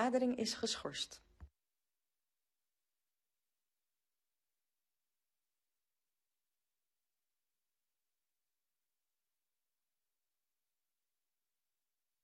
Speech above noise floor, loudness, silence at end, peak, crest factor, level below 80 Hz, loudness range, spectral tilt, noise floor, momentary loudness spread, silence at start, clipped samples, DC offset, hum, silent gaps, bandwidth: over 51 dB; -39 LUFS; 10.8 s; -22 dBFS; 26 dB; -76 dBFS; 11 LU; -3 dB/octave; under -90 dBFS; 10 LU; 0 s; under 0.1%; under 0.1%; none; none; 11.5 kHz